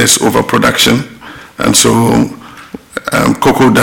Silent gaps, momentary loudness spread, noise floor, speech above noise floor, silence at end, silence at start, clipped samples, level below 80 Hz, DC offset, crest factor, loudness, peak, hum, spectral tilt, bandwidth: none; 22 LU; -30 dBFS; 21 dB; 0 s; 0 s; under 0.1%; -36 dBFS; under 0.1%; 10 dB; -10 LUFS; 0 dBFS; none; -3.5 dB/octave; 17 kHz